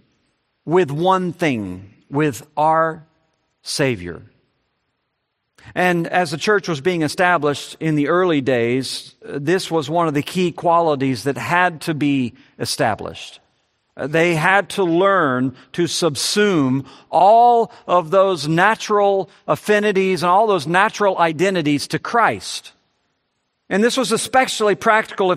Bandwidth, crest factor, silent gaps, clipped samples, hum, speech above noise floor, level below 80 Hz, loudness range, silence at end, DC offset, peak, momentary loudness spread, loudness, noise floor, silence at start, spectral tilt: 14 kHz; 18 dB; none; under 0.1%; none; 56 dB; -62 dBFS; 6 LU; 0 s; under 0.1%; 0 dBFS; 11 LU; -18 LUFS; -73 dBFS; 0.65 s; -4.5 dB/octave